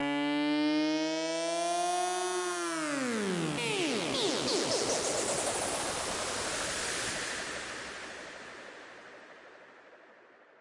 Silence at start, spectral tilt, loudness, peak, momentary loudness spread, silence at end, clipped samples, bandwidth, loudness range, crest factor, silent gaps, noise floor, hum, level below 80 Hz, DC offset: 0 s; -2.5 dB/octave; -32 LUFS; -18 dBFS; 16 LU; 0.4 s; under 0.1%; 11.5 kHz; 8 LU; 16 dB; none; -58 dBFS; none; -64 dBFS; under 0.1%